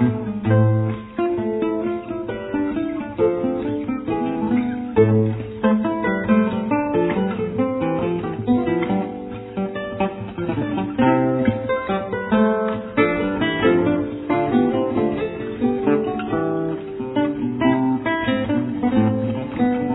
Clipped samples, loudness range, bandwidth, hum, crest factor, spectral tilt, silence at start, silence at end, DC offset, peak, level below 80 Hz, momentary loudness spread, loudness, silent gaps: under 0.1%; 3 LU; 4.1 kHz; none; 18 dB; -11.5 dB/octave; 0 s; 0 s; under 0.1%; -4 dBFS; -48 dBFS; 8 LU; -21 LUFS; none